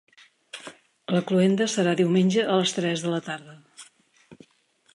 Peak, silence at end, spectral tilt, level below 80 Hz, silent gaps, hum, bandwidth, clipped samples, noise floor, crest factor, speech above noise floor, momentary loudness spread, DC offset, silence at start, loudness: -10 dBFS; 0.6 s; -5.5 dB/octave; -72 dBFS; none; none; 11.5 kHz; under 0.1%; -64 dBFS; 16 dB; 41 dB; 20 LU; under 0.1%; 0.55 s; -23 LUFS